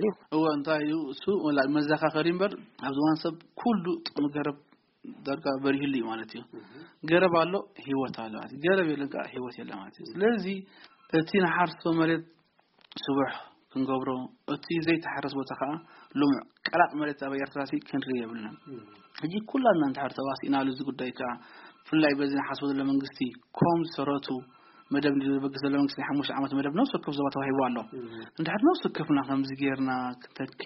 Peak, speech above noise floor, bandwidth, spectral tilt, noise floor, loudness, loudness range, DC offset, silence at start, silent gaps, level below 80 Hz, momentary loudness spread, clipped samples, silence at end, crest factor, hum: -8 dBFS; 35 dB; 5.8 kHz; -4.5 dB/octave; -64 dBFS; -29 LUFS; 3 LU; under 0.1%; 0 s; none; -70 dBFS; 13 LU; under 0.1%; 0 s; 20 dB; none